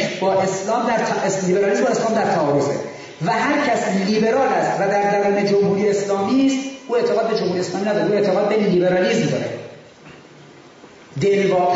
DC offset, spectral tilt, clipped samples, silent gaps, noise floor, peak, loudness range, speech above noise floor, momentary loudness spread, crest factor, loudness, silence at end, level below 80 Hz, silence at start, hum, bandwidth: under 0.1%; -5.5 dB/octave; under 0.1%; none; -44 dBFS; -8 dBFS; 2 LU; 26 dB; 6 LU; 12 dB; -19 LUFS; 0 s; -62 dBFS; 0 s; none; 8 kHz